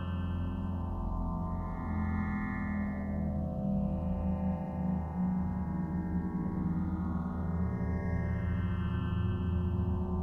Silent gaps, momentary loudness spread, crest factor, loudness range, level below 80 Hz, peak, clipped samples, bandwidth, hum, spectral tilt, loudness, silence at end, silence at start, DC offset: none; 3 LU; 12 dB; 2 LU; -40 dBFS; -22 dBFS; under 0.1%; 3.4 kHz; none; -10.5 dB/octave; -34 LUFS; 0 s; 0 s; under 0.1%